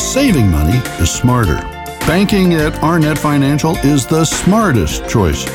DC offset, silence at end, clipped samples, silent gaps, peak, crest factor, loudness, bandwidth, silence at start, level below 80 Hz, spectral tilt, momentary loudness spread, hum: under 0.1%; 0 s; under 0.1%; none; 0 dBFS; 12 dB; -13 LUFS; 18 kHz; 0 s; -24 dBFS; -5.5 dB/octave; 4 LU; none